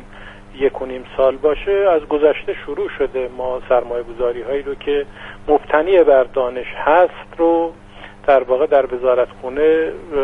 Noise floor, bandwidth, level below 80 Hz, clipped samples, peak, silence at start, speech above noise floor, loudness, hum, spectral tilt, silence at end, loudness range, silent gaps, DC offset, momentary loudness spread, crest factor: -37 dBFS; 4 kHz; -40 dBFS; under 0.1%; 0 dBFS; 0 s; 20 dB; -17 LUFS; none; -7 dB/octave; 0 s; 4 LU; none; under 0.1%; 10 LU; 16 dB